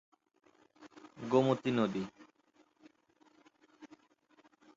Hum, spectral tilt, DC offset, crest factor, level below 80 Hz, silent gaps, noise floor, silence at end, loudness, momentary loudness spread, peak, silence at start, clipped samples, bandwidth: none; -6 dB/octave; under 0.1%; 24 dB; -78 dBFS; none; -70 dBFS; 0.9 s; -33 LUFS; 23 LU; -14 dBFS; 0.8 s; under 0.1%; 7.6 kHz